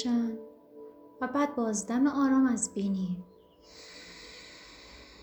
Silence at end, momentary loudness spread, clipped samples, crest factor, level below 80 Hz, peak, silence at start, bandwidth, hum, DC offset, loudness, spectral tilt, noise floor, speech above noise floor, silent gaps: 0 s; 25 LU; under 0.1%; 14 dB; -66 dBFS; -16 dBFS; 0 s; 20 kHz; none; under 0.1%; -29 LUFS; -5 dB/octave; -55 dBFS; 26 dB; none